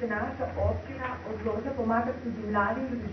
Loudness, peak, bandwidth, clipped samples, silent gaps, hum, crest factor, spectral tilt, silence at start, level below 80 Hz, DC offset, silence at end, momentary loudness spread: -31 LUFS; -12 dBFS; 6.2 kHz; under 0.1%; none; none; 18 dB; -8.5 dB/octave; 0 s; -48 dBFS; under 0.1%; 0 s; 7 LU